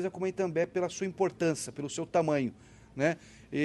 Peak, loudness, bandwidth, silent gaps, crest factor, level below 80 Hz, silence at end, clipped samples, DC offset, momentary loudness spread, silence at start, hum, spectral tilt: -14 dBFS; -32 LUFS; 12.5 kHz; none; 18 dB; -66 dBFS; 0 s; under 0.1%; under 0.1%; 8 LU; 0 s; none; -5.5 dB/octave